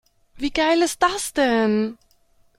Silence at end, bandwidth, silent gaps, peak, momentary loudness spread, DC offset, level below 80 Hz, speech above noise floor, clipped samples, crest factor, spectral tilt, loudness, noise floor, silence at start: 0.65 s; 16.5 kHz; none; -4 dBFS; 8 LU; under 0.1%; -50 dBFS; 39 dB; under 0.1%; 18 dB; -3.5 dB/octave; -21 LUFS; -59 dBFS; 0.35 s